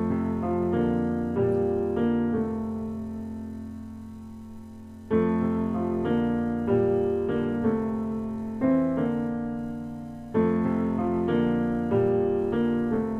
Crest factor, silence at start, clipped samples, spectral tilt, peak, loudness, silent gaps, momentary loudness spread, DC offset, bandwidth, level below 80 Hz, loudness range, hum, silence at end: 14 dB; 0 s; under 0.1%; -9.5 dB/octave; -12 dBFS; -26 LUFS; none; 14 LU; under 0.1%; 4.2 kHz; -50 dBFS; 5 LU; none; 0 s